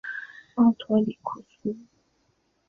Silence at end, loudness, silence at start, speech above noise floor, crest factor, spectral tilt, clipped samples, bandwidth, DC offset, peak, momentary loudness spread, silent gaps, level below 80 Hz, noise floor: 0.85 s; -26 LUFS; 0.05 s; 45 dB; 18 dB; -8.5 dB/octave; under 0.1%; 4 kHz; under 0.1%; -8 dBFS; 15 LU; none; -68 dBFS; -70 dBFS